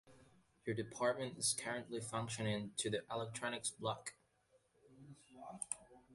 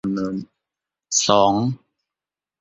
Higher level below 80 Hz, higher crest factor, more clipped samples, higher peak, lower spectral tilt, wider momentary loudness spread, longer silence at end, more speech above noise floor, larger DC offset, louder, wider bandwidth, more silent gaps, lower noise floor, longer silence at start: second, -76 dBFS vs -56 dBFS; about the same, 22 dB vs 20 dB; neither; second, -22 dBFS vs -2 dBFS; about the same, -3.5 dB/octave vs -4 dB/octave; about the same, 15 LU vs 15 LU; second, 0 s vs 0.85 s; second, 34 dB vs 70 dB; neither; second, -42 LUFS vs -19 LUFS; first, 11.5 kHz vs 8.2 kHz; neither; second, -76 dBFS vs -89 dBFS; about the same, 0.05 s vs 0.05 s